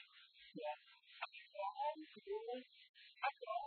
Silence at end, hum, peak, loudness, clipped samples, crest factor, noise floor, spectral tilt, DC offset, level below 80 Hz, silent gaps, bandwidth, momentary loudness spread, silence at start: 0 s; none; -28 dBFS; -48 LUFS; under 0.1%; 20 dB; -66 dBFS; -0.5 dB/octave; under 0.1%; under -90 dBFS; 2.89-2.94 s; 4.5 kHz; 18 LU; 0 s